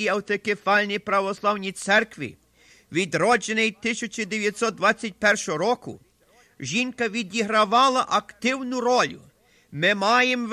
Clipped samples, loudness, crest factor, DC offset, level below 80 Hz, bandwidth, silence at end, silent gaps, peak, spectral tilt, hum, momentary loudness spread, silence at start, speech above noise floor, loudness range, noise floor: under 0.1%; -23 LUFS; 16 dB; under 0.1%; -64 dBFS; 15 kHz; 0 s; none; -8 dBFS; -3.5 dB/octave; none; 9 LU; 0 s; 35 dB; 2 LU; -59 dBFS